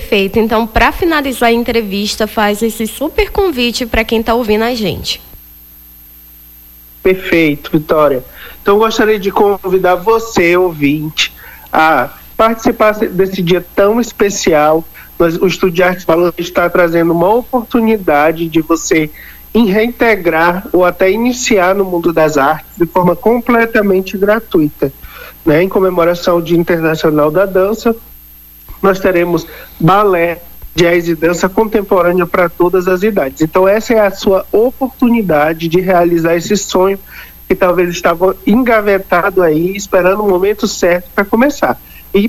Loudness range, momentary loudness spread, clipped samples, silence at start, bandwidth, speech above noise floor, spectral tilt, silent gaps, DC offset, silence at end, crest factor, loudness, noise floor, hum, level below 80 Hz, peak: 2 LU; 6 LU; under 0.1%; 0 s; 18 kHz; 26 dB; -5 dB/octave; none; under 0.1%; 0 s; 12 dB; -12 LUFS; -37 dBFS; none; -34 dBFS; 0 dBFS